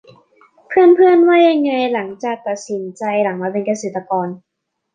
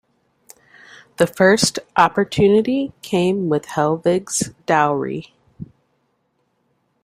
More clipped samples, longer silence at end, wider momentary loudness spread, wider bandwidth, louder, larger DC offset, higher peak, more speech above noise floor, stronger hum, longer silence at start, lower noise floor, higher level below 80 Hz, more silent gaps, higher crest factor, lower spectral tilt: neither; second, 0.6 s vs 1.4 s; second, 14 LU vs 19 LU; second, 9.2 kHz vs 16 kHz; first, -15 LUFS vs -18 LUFS; neither; about the same, -2 dBFS vs 0 dBFS; second, 37 dB vs 50 dB; neither; second, 0.7 s vs 1.2 s; second, -51 dBFS vs -67 dBFS; second, -66 dBFS vs -54 dBFS; neither; about the same, 14 dB vs 18 dB; about the same, -5.5 dB/octave vs -4.5 dB/octave